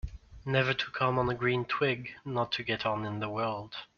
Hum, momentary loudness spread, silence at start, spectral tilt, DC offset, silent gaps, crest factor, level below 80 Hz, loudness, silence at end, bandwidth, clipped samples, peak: none; 8 LU; 0.05 s; -3.5 dB/octave; under 0.1%; none; 20 dB; -52 dBFS; -31 LUFS; 0.15 s; 7 kHz; under 0.1%; -12 dBFS